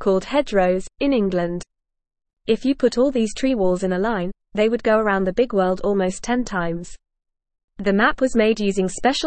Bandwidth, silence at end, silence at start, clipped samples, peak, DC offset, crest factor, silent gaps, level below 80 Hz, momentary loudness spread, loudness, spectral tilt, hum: 8.8 kHz; 0 s; 0 s; under 0.1%; -4 dBFS; 0.4%; 16 dB; 2.33-2.37 s, 7.64-7.68 s; -42 dBFS; 8 LU; -20 LUFS; -5.5 dB/octave; none